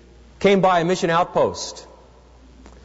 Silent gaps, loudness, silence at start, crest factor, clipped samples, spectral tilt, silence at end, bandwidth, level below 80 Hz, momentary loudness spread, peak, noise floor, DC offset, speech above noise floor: none; -19 LUFS; 0.4 s; 16 dB; under 0.1%; -5 dB/octave; 1 s; 8 kHz; -48 dBFS; 15 LU; -6 dBFS; -48 dBFS; under 0.1%; 29 dB